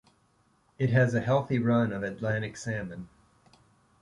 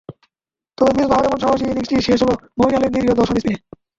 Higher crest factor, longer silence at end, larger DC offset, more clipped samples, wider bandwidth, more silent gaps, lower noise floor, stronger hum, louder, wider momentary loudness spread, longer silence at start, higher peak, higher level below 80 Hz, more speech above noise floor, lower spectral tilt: about the same, 18 dB vs 16 dB; first, 0.95 s vs 0.4 s; neither; neither; first, 11 kHz vs 7.8 kHz; neither; second, -67 dBFS vs -87 dBFS; neither; second, -28 LUFS vs -17 LUFS; first, 10 LU vs 4 LU; first, 0.8 s vs 0.1 s; second, -12 dBFS vs -2 dBFS; second, -60 dBFS vs -42 dBFS; second, 40 dB vs 71 dB; first, -7.5 dB/octave vs -6 dB/octave